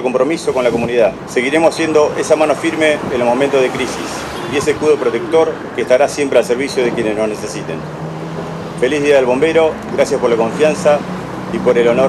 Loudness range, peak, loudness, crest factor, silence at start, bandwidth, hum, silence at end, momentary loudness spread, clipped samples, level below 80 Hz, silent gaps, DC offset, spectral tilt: 3 LU; 0 dBFS; -15 LUFS; 14 dB; 0 s; 13.5 kHz; none; 0 s; 11 LU; under 0.1%; -46 dBFS; none; under 0.1%; -5 dB/octave